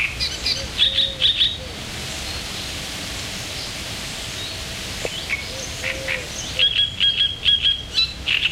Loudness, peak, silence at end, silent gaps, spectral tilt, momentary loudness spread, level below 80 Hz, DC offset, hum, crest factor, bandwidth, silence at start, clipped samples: -20 LUFS; -6 dBFS; 0 s; none; -1.5 dB/octave; 12 LU; -40 dBFS; under 0.1%; none; 18 dB; 16 kHz; 0 s; under 0.1%